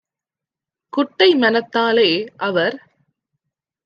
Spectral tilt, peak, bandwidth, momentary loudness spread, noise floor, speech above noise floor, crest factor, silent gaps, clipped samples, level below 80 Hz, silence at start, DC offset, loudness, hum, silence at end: -6 dB/octave; -2 dBFS; 6.8 kHz; 9 LU; -88 dBFS; 71 dB; 18 dB; none; under 0.1%; -74 dBFS; 0.95 s; under 0.1%; -17 LUFS; none; 1.1 s